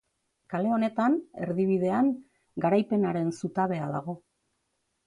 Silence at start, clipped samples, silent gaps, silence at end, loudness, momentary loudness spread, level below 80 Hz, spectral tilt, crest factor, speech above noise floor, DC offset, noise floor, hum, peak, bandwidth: 0.5 s; under 0.1%; none; 0.9 s; -28 LUFS; 11 LU; -70 dBFS; -8 dB/octave; 16 dB; 51 dB; under 0.1%; -77 dBFS; none; -12 dBFS; 11 kHz